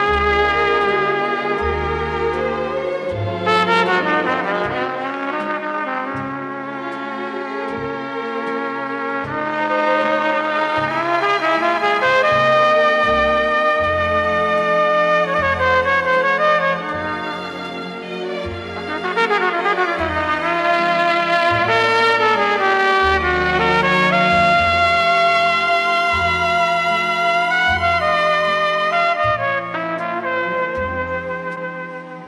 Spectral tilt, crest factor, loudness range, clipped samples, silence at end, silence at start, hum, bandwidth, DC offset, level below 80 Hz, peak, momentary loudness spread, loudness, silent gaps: -5 dB/octave; 14 dB; 7 LU; under 0.1%; 0 s; 0 s; none; 12.5 kHz; under 0.1%; -40 dBFS; -4 dBFS; 11 LU; -17 LUFS; none